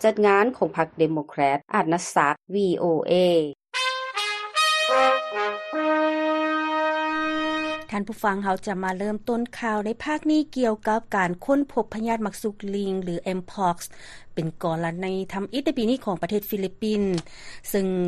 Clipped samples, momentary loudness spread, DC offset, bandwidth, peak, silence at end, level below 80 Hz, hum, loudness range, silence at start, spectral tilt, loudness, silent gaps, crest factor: under 0.1%; 9 LU; under 0.1%; 13 kHz; -4 dBFS; 0 s; -56 dBFS; none; 5 LU; 0 s; -5 dB/octave; -24 LUFS; none; 20 dB